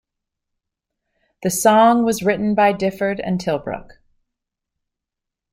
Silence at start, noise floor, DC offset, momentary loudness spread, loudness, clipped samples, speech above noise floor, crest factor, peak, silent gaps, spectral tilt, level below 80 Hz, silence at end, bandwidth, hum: 1.4 s; -84 dBFS; under 0.1%; 13 LU; -17 LUFS; under 0.1%; 67 dB; 20 dB; -2 dBFS; none; -5 dB/octave; -54 dBFS; 1.7 s; 16 kHz; none